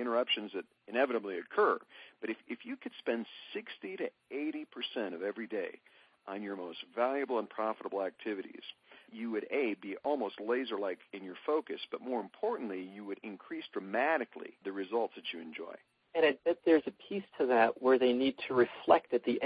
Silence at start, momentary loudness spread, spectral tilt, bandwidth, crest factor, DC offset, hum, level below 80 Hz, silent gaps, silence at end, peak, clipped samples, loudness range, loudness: 0 s; 16 LU; -7 dB/octave; 5 kHz; 24 dB; under 0.1%; none; -82 dBFS; none; 0 s; -12 dBFS; under 0.1%; 9 LU; -35 LUFS